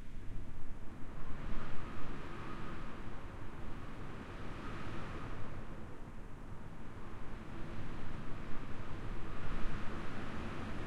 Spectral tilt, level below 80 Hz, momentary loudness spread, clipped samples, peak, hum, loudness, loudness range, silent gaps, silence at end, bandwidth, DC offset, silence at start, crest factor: -6.5 dB/octave; -46 dBFS; 7 LU; under 0.1%; -20 dBFS; none; -48 LUFS; 3 LU; none; 0 s; 6.8 kHz; under 0.1%; 0 s; 14 dB